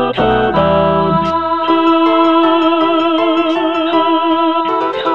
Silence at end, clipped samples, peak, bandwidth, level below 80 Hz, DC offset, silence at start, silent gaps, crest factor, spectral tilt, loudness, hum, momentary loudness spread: 0 s; under 0.1%; 0 dBFS; 6.6 kHz; -40 dBFS; 1%; 0 s; none; 12 dB; -7.5 dB/octave; -12 LUFS; none; 4 LU